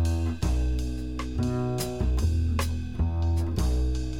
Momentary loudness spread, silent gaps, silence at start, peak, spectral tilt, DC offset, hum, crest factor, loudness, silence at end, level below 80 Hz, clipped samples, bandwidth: 5 LU; none; 0 s; -14 dBFS; -6.5 dB/octave; 0.8%; none; 12 dB; -28 LUFS; 0 s; -28 dBFS; under 0.1%; 18 kHz